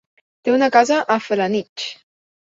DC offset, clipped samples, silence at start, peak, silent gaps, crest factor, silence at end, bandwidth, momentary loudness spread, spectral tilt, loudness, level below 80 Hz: under 0.1%; under 0.1%; 0.45 s; -2 dBFS; 1.69-1.76 s; 18 dB; 0.5 s; 7.8 kHz; 14 LU; -4 dB/octave; -18 LUFS; -68 dBFS